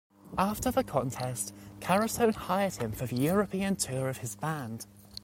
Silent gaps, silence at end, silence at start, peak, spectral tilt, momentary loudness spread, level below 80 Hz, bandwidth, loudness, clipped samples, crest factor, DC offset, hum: none; 0.05 s; 0.25 s; -14 dBFS; -5 dB/octave; 10 LU; -54 dBFS; 16.5 kHz; -31 LUFS; under 0.1%; 18 dB; under 0.1%; none